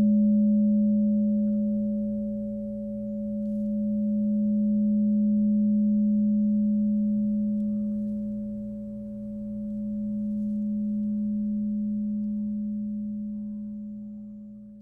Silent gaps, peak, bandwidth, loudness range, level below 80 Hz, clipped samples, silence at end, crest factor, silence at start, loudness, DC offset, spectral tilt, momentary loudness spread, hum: none; -16 dBFS; 0.6 kHz; 7 LU; -54 dBFS; under 0.1%; 0 s; 10 dB; 0 s; -27 LUFS; under 0.1%; -13.5 dB/octave; 13 LU; none